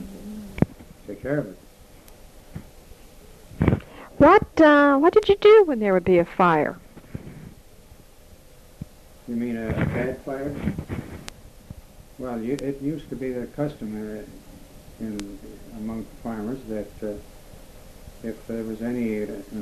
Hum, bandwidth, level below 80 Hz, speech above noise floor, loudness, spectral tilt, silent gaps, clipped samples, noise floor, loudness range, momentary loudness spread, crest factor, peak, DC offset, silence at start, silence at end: none; 13.5 kHz; -44 dBFS; 26 dB; -22 LUFS; -7 dB/octave; none; under 0.1%; -48 dBFS; 17 LU; 27 LU; 20 dB; -4 dBFS; under 0.1%; 0 s; 0 s